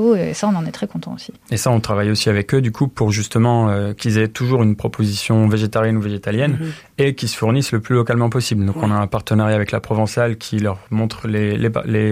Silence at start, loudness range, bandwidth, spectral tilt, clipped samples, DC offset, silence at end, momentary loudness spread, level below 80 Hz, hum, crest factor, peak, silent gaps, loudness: 0 s; 2 LU; 15.5 kHz; -6 dB/octave; under 0.1%; under 0.1%; 0 s; 5 LU; -48 dBFS; none; 14 dB; -4 dBFS; none; -18 LUFS